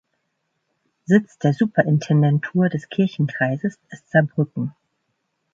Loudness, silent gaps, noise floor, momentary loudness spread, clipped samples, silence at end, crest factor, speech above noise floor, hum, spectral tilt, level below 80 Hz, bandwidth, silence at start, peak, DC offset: -20 LUFS; none; -74 dBFS; 9 LU; under 0.1%; 0.85 s; 20 dB; 54 dB; none; -8 dB/octave; -64 dBFS; 7.6 kHz; 1.1 s; -2 dBFS; under 0.1%